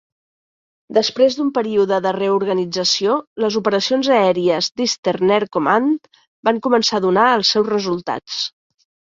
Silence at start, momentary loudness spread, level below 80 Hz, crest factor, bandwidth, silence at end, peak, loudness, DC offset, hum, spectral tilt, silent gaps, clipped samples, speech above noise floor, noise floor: 0.9 s; 8 LU; -62 dBFS; 16 dB; 7.8 kHz; 0.7 s; -2 dBFS; -17 LUFS; under 0.1%; none; -4 dB/octave; 3.27-3.36 s, 4.99-5.03 s, 6.27-6.43 s; under 0.1%; over 73 dB; under -90 dBFS